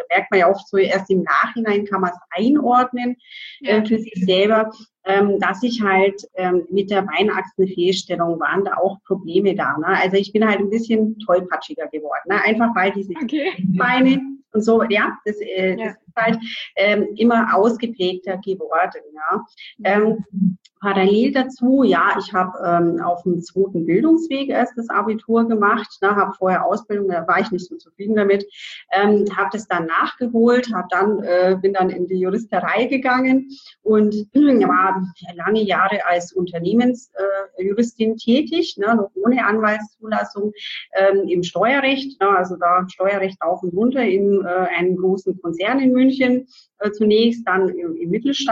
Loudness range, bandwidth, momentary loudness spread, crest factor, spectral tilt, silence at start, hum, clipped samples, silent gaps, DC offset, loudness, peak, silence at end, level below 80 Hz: 2 LU; 7.8 kHz; 9 LU; 14 dB; -6 dB/octave; 0 s; none; under 0.1%; none; under 0.1%; -18 LUFS; -4 dBFS; 0 s; -64 dBFS